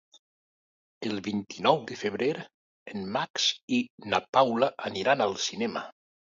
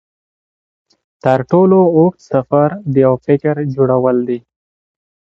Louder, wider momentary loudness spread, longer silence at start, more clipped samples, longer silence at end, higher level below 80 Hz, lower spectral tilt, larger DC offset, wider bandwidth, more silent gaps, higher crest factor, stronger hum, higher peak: second, -28 LUFS vs -13 LUFS; first, 13 LU vs 9 LU; second, 1 s vs 1.25 s; neither; second, 0.45 s vs 0.8 s; second, -70 dBFS vs -54 dBFS; second, -3.5 dB/octave vs -10 dB/octave; neither; about the same, 7.6 kHz vs 7.2 kHz; first, 2.54-2.86 s, 3.30-3.34 s, 3.63-3.68 s, 3.90-3.98 s, 4.29-4.33 s vs none; first, 22 dB vs 14 dB; neither; second, -8 dBFS vs 0 dBFS